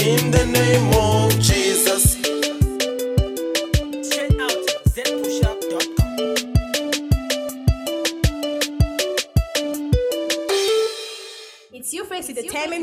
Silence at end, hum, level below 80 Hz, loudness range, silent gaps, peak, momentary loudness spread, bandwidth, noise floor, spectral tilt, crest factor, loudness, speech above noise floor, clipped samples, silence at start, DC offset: 0 s; none; -28 dBFS; 5 LU; none; -2 dBFS; 10 LU; 16 kHz; -40 dBFS; -4 dB/octave; 18 dB; -20 LUFS; 24 dB; under 0.1%; 0 s; under 0.1%